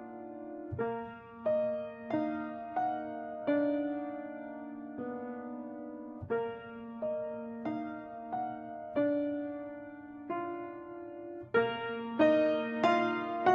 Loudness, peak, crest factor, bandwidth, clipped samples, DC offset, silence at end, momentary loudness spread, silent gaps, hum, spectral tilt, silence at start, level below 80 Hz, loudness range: -35 LUFS; -14 dBFS; 22 dB; 7 kHz; under 0.1%; under 0.1%; 0 s; 15 LU; none; none; -7 dB/octave; 0 s; -72 dBFS; 7 LU